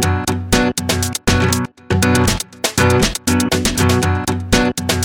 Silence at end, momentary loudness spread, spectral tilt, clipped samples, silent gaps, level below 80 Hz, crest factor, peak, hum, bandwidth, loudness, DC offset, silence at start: 0 s; 5 LU; -4 dB/octave; under 0.1%; none; -30 dBFS; 16 dB; 0 dBFS; none; over 20 kHz; -16 LUFS; under 0.1%; 0 s